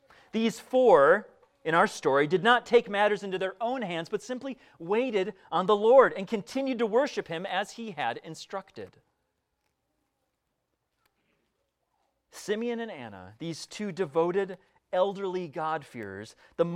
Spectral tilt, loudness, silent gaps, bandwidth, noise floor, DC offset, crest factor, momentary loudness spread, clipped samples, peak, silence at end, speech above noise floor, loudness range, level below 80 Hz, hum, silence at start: -5 dB/octave; -27 LUFS; none; 13.5 kHz; -80 dBFS; under 0.1%; 22 dB; 19 LU; under 0.1%; -6 dBFS; 0 s; 53 dB; 15 LU; -72 dBFS; none; 0.35 s